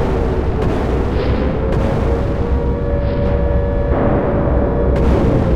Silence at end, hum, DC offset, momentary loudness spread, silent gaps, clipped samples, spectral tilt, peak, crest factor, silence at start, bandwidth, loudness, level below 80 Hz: 0 s; none; under 0.1%; 4 LU; none; under 0.1%; -9 dB/octave; -2 dBFS; 12 dB; 0 s; 6.6 kHz; -17 LUFS; -18 dBFS